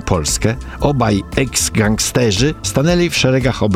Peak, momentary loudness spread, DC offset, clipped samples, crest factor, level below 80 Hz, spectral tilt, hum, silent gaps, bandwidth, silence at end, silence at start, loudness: -2 dBFS; 4 LU; under 0.1%; under 0.1%; 14 dB; -30 dBFS; -4.5 dB/octave; none; none; 16 kHz; 0 s; 0 s; -15 LUFS